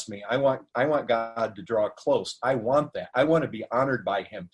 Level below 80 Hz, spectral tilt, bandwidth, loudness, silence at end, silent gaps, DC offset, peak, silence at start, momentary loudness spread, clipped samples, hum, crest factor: -64 dBFS; -6 dB/octave; 11.5 kHz; -26 LUFS; 0.05 s; none; under 0.1%; -10 dBFS; 0 s; 6 LU; under 0.1%; none; 16 dB